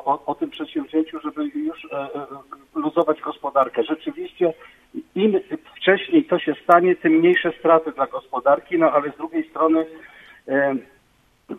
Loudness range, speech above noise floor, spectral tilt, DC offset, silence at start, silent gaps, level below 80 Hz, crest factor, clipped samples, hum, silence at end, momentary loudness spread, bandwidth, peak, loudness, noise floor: 6 LU; 39 dB; -7.5 dB/octave; under 0.1%; 0.05 s; none; -66 dBFS; 20 dB; under 0.1%; none; 0 s; 15 LU; 4 kHz; 0 dBFS; -21 LUFS; -60 dBFS